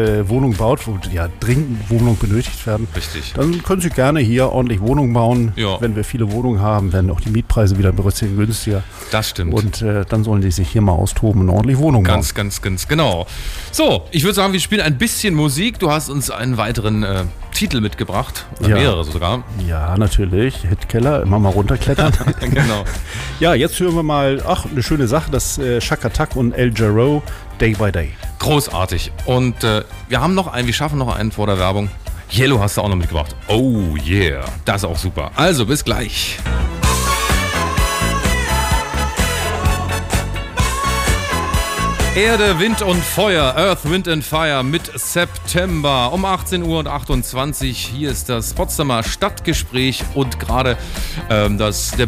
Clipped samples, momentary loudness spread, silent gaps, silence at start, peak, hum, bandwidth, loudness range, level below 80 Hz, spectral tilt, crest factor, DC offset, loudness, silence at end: under 0.1%; 7 LU; none; 0 s; -4 dBFS; none; 16 kHz; 3 LU; -26 dBFS; -5 dB/octave; 12 dB; under 0.1%; -17 LUFS; 0 s